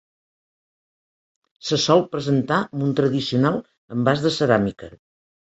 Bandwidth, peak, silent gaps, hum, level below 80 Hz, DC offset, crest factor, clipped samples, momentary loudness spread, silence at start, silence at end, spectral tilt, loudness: 8.2 kHz; -2 dBFS; 3.78-3.88 s; none; -56 dBFS; under 0.1%; 20 dB; under 0.1%; 11 LU; 1.65 s; 0.6 s; -5.5 dB/octave; -21 LUFS